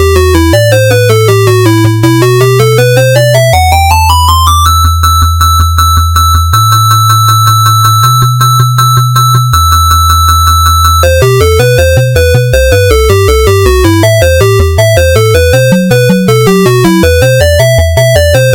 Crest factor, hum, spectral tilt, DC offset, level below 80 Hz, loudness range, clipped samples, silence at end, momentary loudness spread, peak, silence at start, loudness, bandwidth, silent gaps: 4 dB; none; -5 dB/octave; under 0.1%; -18 dBFS; 1 LU; 0.7%; 0 s; 2 LU; 0 dBFS; 0 s; -5 LUFS; 17.5 kHz; none